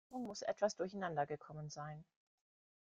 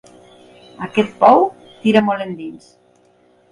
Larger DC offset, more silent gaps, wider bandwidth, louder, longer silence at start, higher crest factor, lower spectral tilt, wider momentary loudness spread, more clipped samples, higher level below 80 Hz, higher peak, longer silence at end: neither; neither; second, 9.4 kHz vs 11 kHz; second, -43 LUFS vs -16 LUFS; second, 0.1 s vs 0.8 s; about the same, 20 dB vs 18 dB; second, -5 dB/octave vs -6.5 dB/octave; second, 11 LU vs 19 LU; neither; second, -78 dBFS vs -62 dBFS; second, -24 dBFS vs 0 dBFS; second, 0.8 s vs 0.95 s